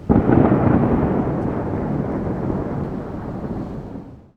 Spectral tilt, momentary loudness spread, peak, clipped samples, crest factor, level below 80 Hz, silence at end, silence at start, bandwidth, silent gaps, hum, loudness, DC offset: -11 dB/octave; 14 LU; 0 dBFS; under 0.1%; 18 dB; -34 dBFS; 0.15 s; 0 s; 6 kHz; none; none; -20 LUFS; under 0.1%